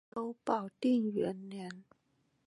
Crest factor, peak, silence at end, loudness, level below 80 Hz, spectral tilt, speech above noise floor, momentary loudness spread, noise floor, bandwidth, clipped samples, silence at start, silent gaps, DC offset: 18 dB; -18 dBFS; 0.65 s; -35 LUFS; -80 dBFS; -7 dB/octave; 41 dB; 15 LU; -76 dBFS; 11 kHz; under 0.1%; 0.15 s; none; under 0.1%